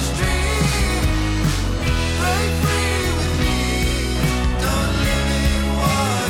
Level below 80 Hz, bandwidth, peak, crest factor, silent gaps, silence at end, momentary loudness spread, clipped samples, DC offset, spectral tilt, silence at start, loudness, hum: -24 dBFS; 17 kHz; -6 dBFS; 12 dB; none; 0 s; 2 LU; under 0.1%; under 0.1%; -4.5 dB/octave; 0 s; -19 LUFS; none